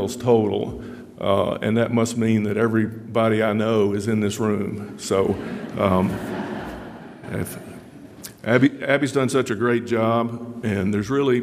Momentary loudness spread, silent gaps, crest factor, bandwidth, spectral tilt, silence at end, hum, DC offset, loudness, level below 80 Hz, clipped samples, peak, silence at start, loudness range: 13 LU; none; 20 dB; 15.5 kHz; -6 dB/octave; 0 s; none; under 0.1%; -22 LUFS; -52 dBFS; under 0.1%; -2 dBFS; 0 s; 4 LU